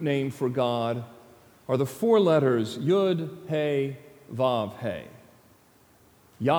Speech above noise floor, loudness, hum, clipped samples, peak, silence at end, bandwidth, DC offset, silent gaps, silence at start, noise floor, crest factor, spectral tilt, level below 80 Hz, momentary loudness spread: 34 dB; -26 LUFS; none; under 0.1%; -10 dBFS; 0 s; over 20 kHz; under 0.1%; none; 0 s; -59 dBFS; 18 dB; -7 dB/octave; -70 dBFS; 14 LU